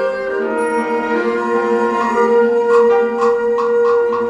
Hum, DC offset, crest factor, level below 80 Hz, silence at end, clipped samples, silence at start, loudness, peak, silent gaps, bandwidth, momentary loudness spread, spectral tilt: none; under 0.1%; 14 dB; -54 dBFS; 0 s; under 0.1%; 0 s; -15 LUFS; -2 dBFS; none; 10.5 kHz; 6 LU; -5.5 dB/octave